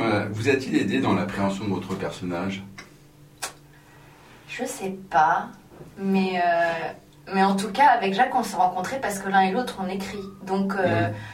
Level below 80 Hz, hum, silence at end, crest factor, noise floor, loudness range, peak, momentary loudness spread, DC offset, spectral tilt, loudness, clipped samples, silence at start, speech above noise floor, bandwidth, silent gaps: -58 dBFS; none; 0 s; 20 dB; -50 dBFS; 9 LU; -6 dBFS; 15 LU; under 0.1%; -5.5 dB/octave; -24 LUFS; under 0.1%; 0 s; 27 dB; 16 kHz; none